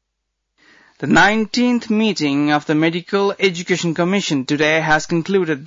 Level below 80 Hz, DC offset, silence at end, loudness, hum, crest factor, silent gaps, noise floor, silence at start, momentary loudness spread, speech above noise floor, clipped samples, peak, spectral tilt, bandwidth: -50 dBFS; under 0.1%; 0 s; -17 LUFS; none; 14 dB; none; -75 dBFS; 1 s; 6 LU; 58 dB; under 0.1%; -4 dBFS; -5 dB/octave; 7.8 kHz